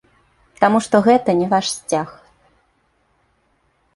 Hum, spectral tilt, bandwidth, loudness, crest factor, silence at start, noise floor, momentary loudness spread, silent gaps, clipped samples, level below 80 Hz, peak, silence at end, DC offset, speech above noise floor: none; -5 dB/octave; 11.5 kHz; -17 LUFS; 18 dB; 0.6 s; -63 dBFS; 9 LU; none; under 0.1%; -58 dBFS; -2 dBFS; 1.85 s; under 0.1%; 47 dB